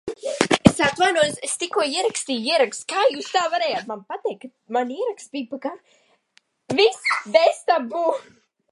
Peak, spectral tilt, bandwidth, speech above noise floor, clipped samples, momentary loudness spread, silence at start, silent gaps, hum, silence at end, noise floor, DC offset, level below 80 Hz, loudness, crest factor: 0 dBFS; -3.5 dB/octave; 11.5 kHz; 40 dB; under 0.1%; 13 LU; 0.05 s; none; none; 0.5 s; -62 dBFS; under 0.1%; -50 dBFS; -21 LUFS; 22 dB